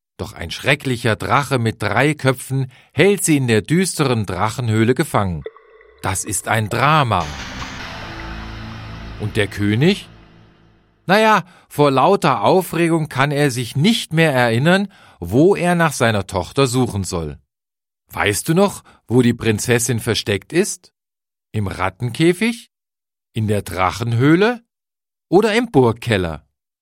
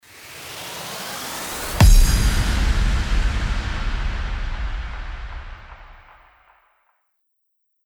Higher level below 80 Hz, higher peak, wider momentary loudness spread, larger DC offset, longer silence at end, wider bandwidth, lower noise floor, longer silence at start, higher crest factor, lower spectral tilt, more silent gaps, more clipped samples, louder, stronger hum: second, -44 dBFS vs -22 dBFS; about the same, 0 dBFS vs -2 dBFS; second, 15 LU vs 20 LU; neither; second, 0.45 s vs 1.9 s; second, 16.5 kHz vs over 20 kHz; first, under -90 dBFS vs -71 dBFS; about the same, 0.2 s vs 0.15 s; about the same, 18 dB vs 20 dB; about the same, -5 dB/octave vs -4 dB/octave; neither; neither; first, -17 LUFS vs -23 LUFS; neither